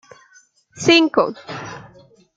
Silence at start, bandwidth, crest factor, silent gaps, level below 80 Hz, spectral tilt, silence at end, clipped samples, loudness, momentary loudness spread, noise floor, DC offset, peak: 0.75 s; 7.8 kHz; 20 dB; none; -60 dBFS; -3.5 dB/octave; 0.55 s; under 0.1%; -16 LUFS; 21 LU; -54 dBFS; under 0.1%; -2 dBFS